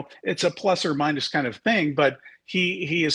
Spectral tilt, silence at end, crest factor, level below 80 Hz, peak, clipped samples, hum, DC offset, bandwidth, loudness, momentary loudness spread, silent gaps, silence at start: -4.5 dB/octave; 0 s; 16 dB; -66 dBFS; -8 dBFS; under 0.1%; none; under 0.1%; 11 kHz; -23 LUFS; 4 LU; none; 0 s